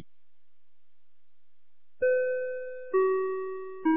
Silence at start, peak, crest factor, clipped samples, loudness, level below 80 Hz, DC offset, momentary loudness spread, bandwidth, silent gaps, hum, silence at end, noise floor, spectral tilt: 2 s; -16 dBFS; 16 dB; under 0.1%; -29 LUFS; -74 dBFS; 0.7%; 10 LU; 3.6 kHz; none; 50 Hz at -90 dBFS; 0 s; -83 dBFS; -9 dB/octave